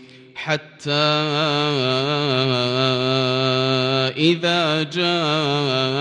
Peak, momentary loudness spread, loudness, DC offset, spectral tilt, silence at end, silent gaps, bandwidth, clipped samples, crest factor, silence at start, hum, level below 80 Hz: -4 dBFS; 6 LU; -19 LUFS; under 0.1%; -5.5 dB/octave; 0 s; none; 10.5 kHz; under 0.1%; 16 dB; 0 s; none; -62 dBFS